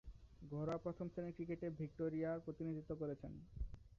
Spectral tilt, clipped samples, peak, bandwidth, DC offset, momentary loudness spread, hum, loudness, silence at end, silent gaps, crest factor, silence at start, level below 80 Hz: -9 dB/octave; under 0.1%; -32 dBFS; 7.2 kHz; under 0.1%; 10 LU; none; -47 LUFS; 0.05 s; none; 14 dB; 0.05 s; -58 dBFS